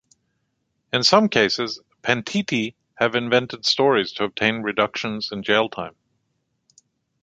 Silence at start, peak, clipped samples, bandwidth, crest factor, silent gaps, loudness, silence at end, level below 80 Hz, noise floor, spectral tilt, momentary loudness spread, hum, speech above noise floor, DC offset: 0.95 s; 0 dBFS; under 0.1%; 9.2 kHz; 22 dB; none; -21 LUFS; 1.3 s; -62 dBFS; -73 dBFS; -4 dB/octave; 11 LU; none; 52 dB; under 0.1%